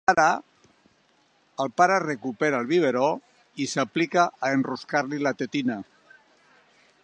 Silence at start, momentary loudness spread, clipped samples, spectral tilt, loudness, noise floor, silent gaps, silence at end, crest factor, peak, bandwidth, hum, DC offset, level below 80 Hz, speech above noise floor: 0.1 s; 11 LU; under 0.1%; -4.5 dB/octave; -25 LUFS; -64 dBFS; none; 1.2 s; 22 dB; -4 dBFS; 9.4 kHz; none; under 0.1%; -70 dBFS; 40 dB